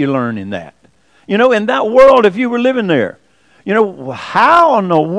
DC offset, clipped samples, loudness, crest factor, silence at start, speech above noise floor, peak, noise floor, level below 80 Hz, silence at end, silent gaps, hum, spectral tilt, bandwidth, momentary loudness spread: under 0.1%; 1%; -11 LUFS; 12 dB; 0 s; 40 dB; 0 dBFS; -51 dBFS; -48 dBFS; 0 s; none; none; -6.5 dB/octave; 10.5 kHz; 16 LU